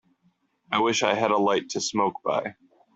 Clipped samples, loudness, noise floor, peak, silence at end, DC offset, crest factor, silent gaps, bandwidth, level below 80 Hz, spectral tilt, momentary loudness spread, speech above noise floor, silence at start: under 0.1%; -24 LUFS; -68 dBFS; -6 dBFS; 0.45 s; under 0.1%; 20 dB; none; 8.2 kHz; -70 dBFS; -3 dB/octave; 6 LU; 44 dB; 0.7 s